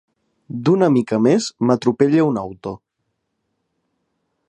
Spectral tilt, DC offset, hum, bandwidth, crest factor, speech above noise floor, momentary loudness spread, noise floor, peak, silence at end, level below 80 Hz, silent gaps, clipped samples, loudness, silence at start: -6.5 dB/octave; under 0.1%; none; 10.5 kHz; 18 dB; 57 dB; 16 LU; -74 dBFS; -2 dBFS; 1.75 s; -60 dBFS; none; under 0.1%; -17 LUFS; 0.5 s